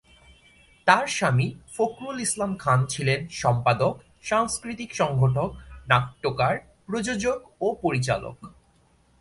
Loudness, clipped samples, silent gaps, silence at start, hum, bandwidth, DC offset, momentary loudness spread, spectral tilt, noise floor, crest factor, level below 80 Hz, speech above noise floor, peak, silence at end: -25 LUFS; under 0.1%; none; 0.85 s; none; 11.5 kHz; under 0.1%; 8 LU; -5 dB/octave; -61 dBFS; 22 dB; -52 dBFS; 37 dB; -2 dBFS; 0.7 s